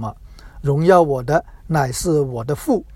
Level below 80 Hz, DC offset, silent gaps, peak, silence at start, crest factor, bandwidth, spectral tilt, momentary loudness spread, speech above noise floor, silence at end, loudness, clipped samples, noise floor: -40 dBFS; under 0.1%; none; 0 dBFS; 0 s; 18 dB; 16.5 kHz; -6.5 dB/octave; 10 LU; 21 dB; 0 s; -18 LUFS; under 0.1%; -39 dBFS